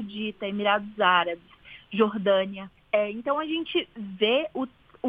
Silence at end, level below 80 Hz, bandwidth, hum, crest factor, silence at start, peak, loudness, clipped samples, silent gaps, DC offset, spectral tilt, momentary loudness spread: 0 s; -64 dBFS; 5 kHz; none; 20 dB; 0 s; -8 dBFS; -26 LUFS; under 0.1%; none; under 0.1%; -7.5 dB/octave; 12 LU